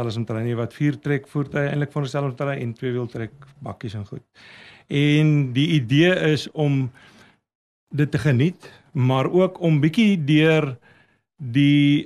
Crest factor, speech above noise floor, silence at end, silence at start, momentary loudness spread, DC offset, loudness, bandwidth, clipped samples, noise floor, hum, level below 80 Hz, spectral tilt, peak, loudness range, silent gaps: 16 dB; 37 dB; 0 s; 0 s; 16 LU; under 0.1%; -21 LUFS; 11 kHz; under 0.1%; -58 dBFS; none; -58 dBFS; -7.5 dB/octave; -4 dBFS; 7 LU; 7.55-7.87 s